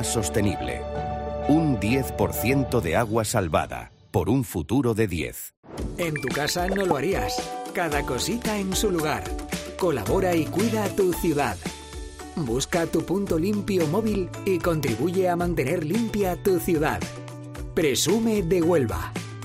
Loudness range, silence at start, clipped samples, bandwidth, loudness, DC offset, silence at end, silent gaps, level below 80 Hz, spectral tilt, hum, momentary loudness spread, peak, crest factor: 2 LU; 0 s; under 0.1%; 16 kHz; -25 LUFS; under 0.1%; 0 s; 5.57-5.63 s; -40 dBFS; -5 dB/octave; none; 9 LU; -8 dBFS; 16 dB